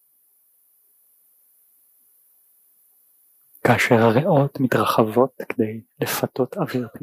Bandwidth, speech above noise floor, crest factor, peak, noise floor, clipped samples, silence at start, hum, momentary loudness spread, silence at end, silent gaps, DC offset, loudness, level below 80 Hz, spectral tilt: 15.5 kHz; 41 dB; 20 dB; -4 dBFS; -61 dBFS; under 0.1%; 3.65 s; none; 9 LU; 0.05 s; none; under 0.1%; -20 LUFS; -64 dBFS; -6 dB/octave